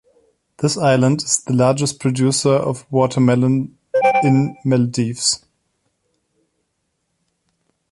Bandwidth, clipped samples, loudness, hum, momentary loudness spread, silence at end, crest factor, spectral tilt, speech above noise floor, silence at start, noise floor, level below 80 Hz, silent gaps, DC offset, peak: 11.5 kHz; under 0.1%; -17 LUFS; none; 6 LU; 2.55 s; 16 dB; -5 dB/octave; 55 dB; 0.6 s; -71 dBFS; -58 dBFS; none; under 0.1%; -2 dBFS